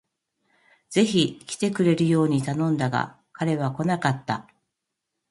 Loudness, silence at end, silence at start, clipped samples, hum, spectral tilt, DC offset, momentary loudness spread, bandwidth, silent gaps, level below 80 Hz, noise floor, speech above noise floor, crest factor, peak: -24 LUFS; 0.9 s; 0.9 s; under 0.1%; none; -6 dB/octave; under 0.1%; 9 LU; 11.5 kHz; none; -64 dBFS; -82 dBFS; 59 dB; 18 dB; -6 dBFS